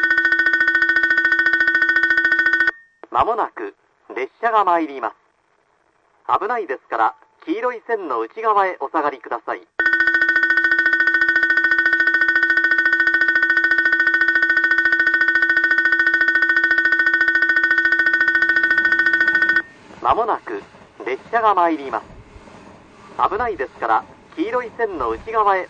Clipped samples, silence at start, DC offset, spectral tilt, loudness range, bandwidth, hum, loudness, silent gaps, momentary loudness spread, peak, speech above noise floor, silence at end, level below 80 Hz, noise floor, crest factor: under 0.1%; 0 s; under 0.1%; -4 dB/octave; 8 LU; 8.2 kHz; none; -16 LUFS; none; 12 LU; -4 dBFS; 41 dB; 0 s; -52 dBFS; -62 dBFS; 14 dB